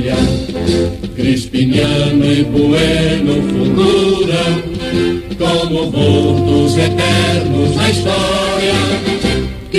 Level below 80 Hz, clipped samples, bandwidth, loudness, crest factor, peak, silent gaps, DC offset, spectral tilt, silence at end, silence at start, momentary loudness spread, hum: -30 dBFS; under 0.1%; 13 kHz; -13 LUFS; 12 dB; 0 dBFS; none; under 0.1%; -6 dB/octave; 0 s; 0 s; 5 LU; none